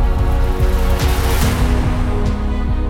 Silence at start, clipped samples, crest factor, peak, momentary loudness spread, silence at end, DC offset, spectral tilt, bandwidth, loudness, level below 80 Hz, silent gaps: 0 s; under 0.1%; 10 dB; -4 dBFS; 3 LU; 0 s; under 0.1%; -6 dB/octave; 17 kHz; -18 LUFS; -16 dBFS; none